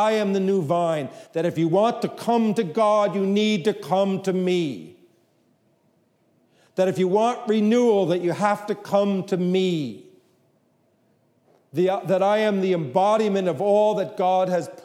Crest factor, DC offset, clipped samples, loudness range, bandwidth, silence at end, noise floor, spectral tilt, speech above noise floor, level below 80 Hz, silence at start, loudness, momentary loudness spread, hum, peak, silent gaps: 16 dB; under 0.1%; under 0.1%; 5 LU; 14.5 kHz; 0.05 s; -64 dBFS; -6.5 dB/octave; 43 dB; -78 dBFS; 0 s; -22 LUFS; 6 LU; none; -6 dBFS; none